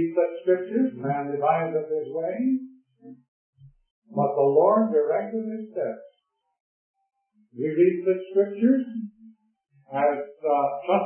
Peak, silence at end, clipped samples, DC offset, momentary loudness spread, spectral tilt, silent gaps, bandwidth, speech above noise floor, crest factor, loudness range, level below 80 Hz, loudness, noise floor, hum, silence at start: -8 dBFS; 0 s; under 0.1%; under 0.1%; 12 LU; -11.5 dB/octave; 3.28-3.53 s, 3.91-4.02 s, 6.60-6.94 s; 3.3 kHz; 41 dB; 18 dB; 3 LU; -78 dBFS; -24 LUFS; -64 dBFS; none; 0 s